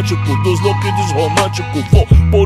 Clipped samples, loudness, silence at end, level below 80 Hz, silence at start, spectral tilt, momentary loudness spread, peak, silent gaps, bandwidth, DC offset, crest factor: 0.1%; -14 LUFS; 0 s; -20 dBFS; 0 s; -6 dB/octave; 5 LU; 0 dBFS; none; 13.5 kHz; under 0.1%; 12 dB